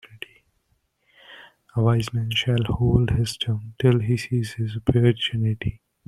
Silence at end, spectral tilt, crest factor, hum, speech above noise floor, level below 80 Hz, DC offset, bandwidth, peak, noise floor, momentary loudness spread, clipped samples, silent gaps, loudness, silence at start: 0.3 s; -6.5 dB/octave; 18 dB; none; 48 dB; -42 dBFS; under 0.1%; 12.5 kHz; -4 dBFS; -69 dBFS; 10 LU; under 0.1%; none; -23 LUFS; 0.15 s